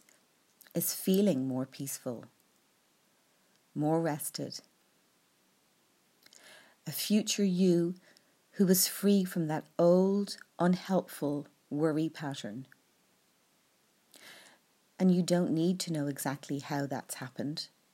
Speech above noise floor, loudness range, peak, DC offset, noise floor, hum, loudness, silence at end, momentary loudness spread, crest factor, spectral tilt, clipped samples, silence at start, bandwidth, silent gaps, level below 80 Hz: 40 dB; 9 LU; -14 dBFS; under 0.1%; -70 dBFS; none; -31 LUFS; 0.25 s; 15 LU; 18 dB; -5.5 dB/octave; under 0.1%; 0.75 s; 16 kHz; none; -86 dBFS